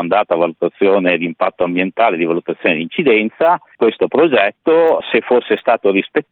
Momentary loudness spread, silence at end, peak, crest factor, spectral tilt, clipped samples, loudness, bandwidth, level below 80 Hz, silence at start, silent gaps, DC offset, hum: 5 LU; 0.1 s; 0 dBFS; 14 dB; -8.5 dB/octave; under 0.1%; -15 LUFS; 4.3 kHz; -60 dBFS; 0 s; none; under 0.1%; none